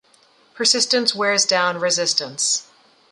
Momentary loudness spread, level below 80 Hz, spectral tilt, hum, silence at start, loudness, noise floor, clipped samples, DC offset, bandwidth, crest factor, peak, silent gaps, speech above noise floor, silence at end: 4 LU; -74 dBFS; -0.5 dB/octave; none; 0.55 s; -18 LUFS; -56 dBFS; under 0.1%; under 0.1%; 11.5 kHz; 18 dB; -2 dBFS; none; 36 dB; 0.5 s